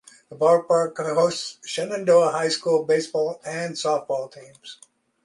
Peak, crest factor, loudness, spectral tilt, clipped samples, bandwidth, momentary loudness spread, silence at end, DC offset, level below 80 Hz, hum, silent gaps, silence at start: -4 dBFS; 18 dB; -22 LUFS; -4 dB/octave; under 0.1%; 11.5 kHz; 16 LU; 0.5 s; under 0.1%; -74 dBFS; none; none; 0.3 s